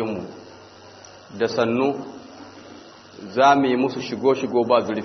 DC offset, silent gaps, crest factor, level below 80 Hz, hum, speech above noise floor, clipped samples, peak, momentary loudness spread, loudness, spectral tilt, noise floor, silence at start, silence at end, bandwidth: under 0.1%; none; 20 dB; -66 dBFS; none; 24 dB; under 0.1%; -4 dBFS; 25 LU; -21 LUFS; -5.5 dB/octave; -45 dBFS; 0 s; 0 s; 6.4 kHz